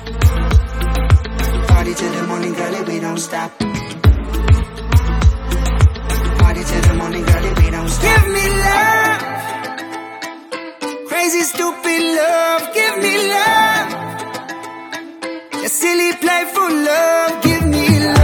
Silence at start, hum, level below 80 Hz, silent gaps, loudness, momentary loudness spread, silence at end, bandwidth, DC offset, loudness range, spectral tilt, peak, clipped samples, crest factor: 0 s; none; -20 dBFS; none; -15 LUFS; 13 LU; 0 s; 19 kHz; under 0.1%; 4 LU; -5 dB/octave; 0 dBFS; under 0.1%; 14 dB